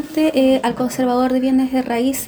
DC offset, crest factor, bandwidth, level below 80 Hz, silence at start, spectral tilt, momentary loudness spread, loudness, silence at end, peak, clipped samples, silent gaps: under 0.1%; 12 dB; over 20 kHz; -50 dBFS; 0 s; -4.5 dB/octave; 4 LU; -17 LUFS; 0 s; -4 dBFS; under 0.1%; none